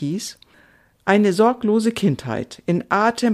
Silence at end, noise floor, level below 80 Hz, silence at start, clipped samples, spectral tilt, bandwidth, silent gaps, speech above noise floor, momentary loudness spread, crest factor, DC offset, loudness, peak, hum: 0 s; -54 dBFS; -58 dBFS; 0 s; under 0.1%; -6 dB/octave; 14 kHz; none; 35 dB; 11 LU; 16 dB; under 0.1%; -19 LUFS; -2 dBFS; none